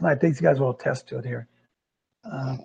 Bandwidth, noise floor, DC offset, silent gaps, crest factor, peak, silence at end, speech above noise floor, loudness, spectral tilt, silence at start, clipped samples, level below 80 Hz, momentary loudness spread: 9 kHz; -83 dBFS; under 0.1%; none; 20 dB; -6 dBFS; 0 s; 59 dB; -25 LUFS; -8 dB/octave; 0 s; under 0.1%; -66 dBFS; 14 LU